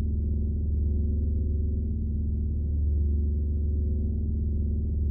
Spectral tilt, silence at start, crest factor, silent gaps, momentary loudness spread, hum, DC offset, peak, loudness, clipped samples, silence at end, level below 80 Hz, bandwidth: -19 dB/octave; 0 s; 8 dB; none; 2 LU; none; under 0.1%; -18 dBFS; -29 LUFS; under 0.1%; 0 s; -28 dBFS; 0.7 kHz